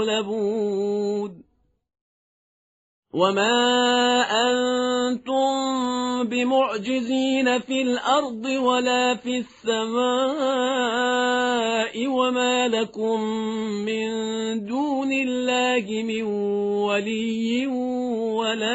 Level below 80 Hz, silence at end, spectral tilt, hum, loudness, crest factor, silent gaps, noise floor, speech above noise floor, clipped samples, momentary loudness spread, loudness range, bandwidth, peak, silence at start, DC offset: -66 dBFS; 0 s; -2 dB/octave; none; -23 LUFS; 18 dB; 2.01-3.03 s; under -90 dBFS; over 67 dB; under 0.1%; 7 LU; 3 LU; 8 kHz; -6 dBFS; 0 s; under 0.1%